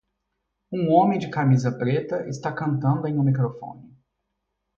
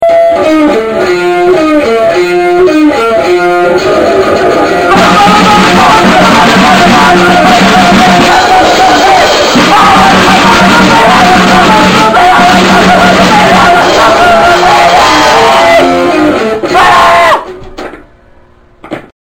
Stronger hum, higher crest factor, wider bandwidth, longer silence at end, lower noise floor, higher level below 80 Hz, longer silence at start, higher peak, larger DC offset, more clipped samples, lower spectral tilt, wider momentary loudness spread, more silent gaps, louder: first, 50 Hz at -55 dBFS vs none; first, 20 dB vs 4 dB; second, 7.4 kHz vs 18 kHz; first, 0.9 s vs 0.3 s; first, -78 dBFS vs -38 dBFS; second, -62 dBFS vs -30 dBFS; first, 0.7 s vs 0 s; second, -4 dBFS vs 0 dBFS; neither; second, under 0.1% vs 7%; first, -8.5 dB/octave vs -4 dB/octave; first, 11 LU vs 4 LU; neither; second, -23 LUFS vs -4 LUFS